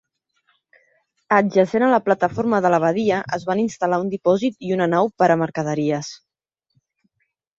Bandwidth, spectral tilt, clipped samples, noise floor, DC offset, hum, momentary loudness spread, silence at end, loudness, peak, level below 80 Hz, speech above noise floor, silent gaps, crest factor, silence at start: 7.8 kHz; -6.5 dB/octave; under 0.1%; -79 dBFS; under 0.1%; none; 6 LU; 1.45 s; -19 LUFS; -2 dBFS; -62 dBFS; 60 dB; none; 18 dB; 1.3 s